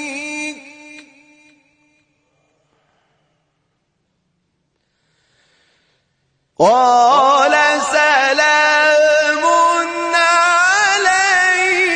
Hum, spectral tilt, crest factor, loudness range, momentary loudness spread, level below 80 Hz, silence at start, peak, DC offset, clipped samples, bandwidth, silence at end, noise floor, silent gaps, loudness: none; -1 dB/octave; 16 dB; 11 LU; 8 LU; -60 dBFS; 0 s; 0 dBFS; under 0.1%; under 0.1%; 10 kHz; 0 s; -68 dBFS; none; -12 LUFS